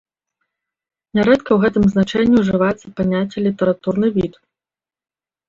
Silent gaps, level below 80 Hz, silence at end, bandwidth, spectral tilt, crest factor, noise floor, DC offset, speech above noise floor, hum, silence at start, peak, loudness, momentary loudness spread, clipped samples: none; -46 dBFS; 1.15 s; 7.4 kHz; -7.5 dB/octave; 16 dB; under -90 dBFS; under 0.1%; over 74 dB; none; 1.15 s; -2 dBFS; -17 LUFS; 7 LU; under 0.1%